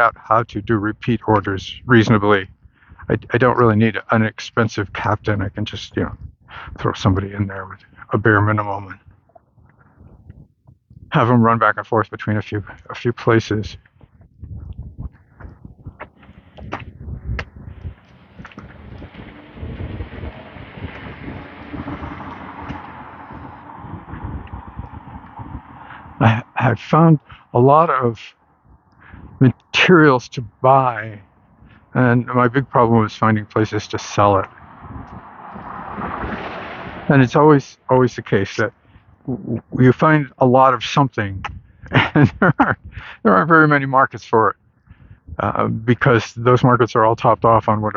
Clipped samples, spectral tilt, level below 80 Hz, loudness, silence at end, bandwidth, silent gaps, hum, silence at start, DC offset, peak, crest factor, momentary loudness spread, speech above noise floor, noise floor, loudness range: under 0.1%; -7 dB/octave; -42 dBFS; -17 LUFS; 0.05 s; 7.2 kHz; none; none; 0 s; under 0.1%; 0 dBFS; 18 dB; 23 LU; 36 dB; -52 dBFS; 18 LU